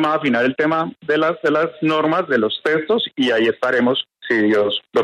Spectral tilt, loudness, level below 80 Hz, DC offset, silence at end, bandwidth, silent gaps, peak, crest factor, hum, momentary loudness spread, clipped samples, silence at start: -6 dB/octave; -18 LUFS; -64 dBFS; under 0.1%; 0 s; 10.5 kHz; none; -6 dBFS; 12 dB; none; 3 LU; under 0.1%; 0 s